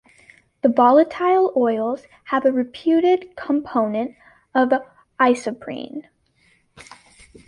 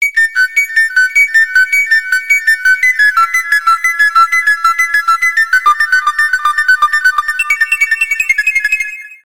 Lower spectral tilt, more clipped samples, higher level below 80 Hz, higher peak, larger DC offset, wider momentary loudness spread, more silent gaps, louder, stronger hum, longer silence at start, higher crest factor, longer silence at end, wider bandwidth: first, -5.5 dB/octave vs 3.5 dB/octave; neither; second, -62 dBFS vs -50 dBFS; about the same, -2 dBFS vs 0 dBFS; second, under 0.1% vs 1%; first, 15 LU vs 4 LU; neither; second, -19 LUFS vs -9 LUFS; neither; first, 0.65 s vs 0 s; first, 18 dB vs 10 dB; first, 1.45 s vs 0.05 s; second, 11 kHz vs 18.5 kHz